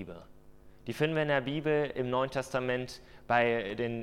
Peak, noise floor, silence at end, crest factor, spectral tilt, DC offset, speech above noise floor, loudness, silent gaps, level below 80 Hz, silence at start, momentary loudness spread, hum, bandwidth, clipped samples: -12 dBFS; -54 dBFS; 0 s; 20 dB; -6 dB/octave; under 0.1%; 22 dB; -31 LUFS; none; -60 dBFS; 0 s; 17 LU; none; 15.5 kHz; under 0.1%